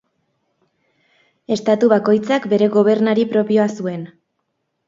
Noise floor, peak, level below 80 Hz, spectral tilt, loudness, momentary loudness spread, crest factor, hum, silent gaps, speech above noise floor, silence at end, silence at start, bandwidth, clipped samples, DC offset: -72 dBFS; 0 dBFS; -66 dBFS; -6.5 dB/octave; -16 LUFS; 12 LU; 18 dB; none; none; 57 dB; 0.8 s; 1.5 s; 7.6 kHz; under 0.1%; under 0.1%